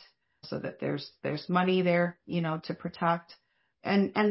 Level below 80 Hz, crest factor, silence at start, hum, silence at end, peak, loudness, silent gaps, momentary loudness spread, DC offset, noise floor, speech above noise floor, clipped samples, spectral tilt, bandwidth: -70 dBFS; 18 dB; 0.45 s; none; 0 s; -12 dBFS; -30 LUFS; none; 12 LU; under 0.1%; -54 dBFS; 25 dB; under 0.1%; -10.5 dB/octave; 5.8 kHz